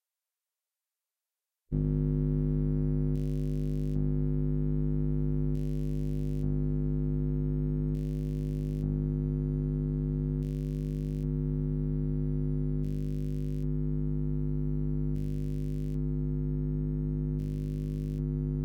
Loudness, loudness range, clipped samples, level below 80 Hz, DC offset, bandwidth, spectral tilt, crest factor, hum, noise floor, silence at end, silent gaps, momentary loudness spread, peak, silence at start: -32 LUFS; 2 LU; under 0.1%; -36 dBFS; under 0.1%; 3.2 kHz; -11 dB/octave; 12 dB; none; under -90 dBFS; 0 s; none; 4 LU; -18 dBFS; 1.7 s